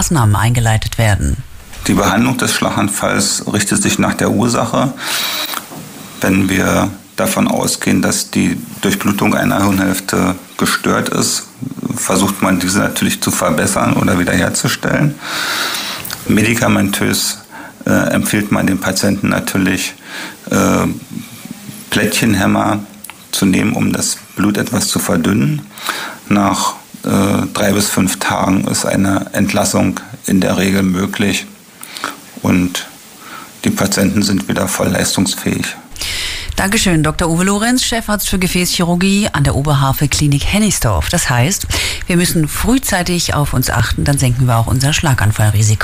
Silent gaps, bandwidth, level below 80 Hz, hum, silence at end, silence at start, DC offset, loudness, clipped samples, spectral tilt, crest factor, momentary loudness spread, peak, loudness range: none; 16 kHz; -32 dBFS; none; 0 s; 0 s; under 0.1%; -14 LUFS; under 0.1%; -4.5 dB/octave; 12 dB; 9 LU; -2 dBFS; 2 LU